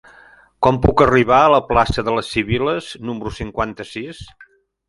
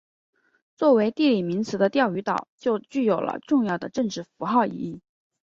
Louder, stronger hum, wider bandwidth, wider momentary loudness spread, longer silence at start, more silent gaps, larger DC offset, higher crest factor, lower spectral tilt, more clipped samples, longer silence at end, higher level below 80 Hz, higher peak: first, -17 LUFS vs -24 LUFS; neither; first, 11.5 kHz vs 7.6 kHz; first, 17 LU vs 9 LU; second, 0.6 s vs 0.8 s; second, none vs 2.49-2.58 s; neither; about the same, 18 dB vs 18 dB; about the same, -6.5 dB/octave vs -6.5 dB/octave; neither; first, 0.65 s vs 0.45 s; first, -34 dBFS vs -68 dBFS; first, 0 dBFS vs -6 dBFS